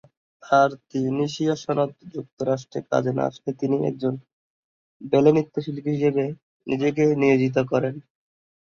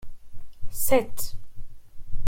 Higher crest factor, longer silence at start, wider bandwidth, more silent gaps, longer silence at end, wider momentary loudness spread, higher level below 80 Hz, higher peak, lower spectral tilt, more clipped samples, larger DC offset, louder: about the same, 20 dB vs 16 dB; first, 0.45 s vs 0 s; second, 7.4 kHz vs 16.5 kHz; first, 2.32-2.37 s, 4.33-5.00 s, 6.42-6.60 s vs none; first, 0.7 s vs 0 s; second, 11 LU vs 24 LU; second, -64 dBFS vs -36 dBFS; about the same, -4 dBFS vs -6 dBFS; first, -7 dB/octave vs -4 dB/octave; neither; neither; first, -23 LUFS vs -27 LUFS